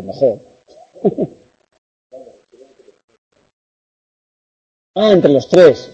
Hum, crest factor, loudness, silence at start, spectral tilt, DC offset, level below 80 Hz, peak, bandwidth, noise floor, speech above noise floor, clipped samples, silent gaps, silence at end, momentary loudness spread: none; 16 dB; -13 LUFS; 0 s; -6.5 dB/octave; under 0.1%; -58 dBFS; 0 dBFS; 8.2 kHz; -47 dBFS; 35 dB; under 0.1%; 1.78-2.10 s, 3.04-3.08 s, 3.18-3.31 s, 3.53-4.94 s; 0.1 s; 16 LU